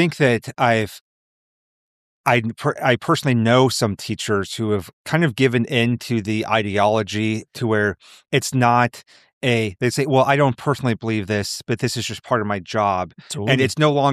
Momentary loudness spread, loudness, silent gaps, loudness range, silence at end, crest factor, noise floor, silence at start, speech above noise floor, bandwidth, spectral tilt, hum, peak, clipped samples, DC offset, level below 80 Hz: 7 LU; -20 LUFS; 1.01-2.24 s, 4.93-5.05 s, 9.33-9.41 s; 2 LU; 0 s; 18 dB; under -90 dBFS; 0 s; over 71 dB; 14.5 kHz; -5.5 dB/octave; none; -2 dBFS; under 0.1%; under 0.1%; -56 dBFS